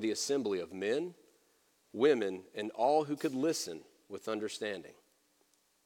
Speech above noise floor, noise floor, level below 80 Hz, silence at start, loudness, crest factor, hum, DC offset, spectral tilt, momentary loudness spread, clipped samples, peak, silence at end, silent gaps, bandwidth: 39 dB; -73 dBFS; -84 dBFS; 0 s; -34 LUFS; 20 dB; none; under 0.1%; -4 dB/octave; 15 LU; under 0.1%; -16 dBFS; 0.95 s; none; 17.5 kHz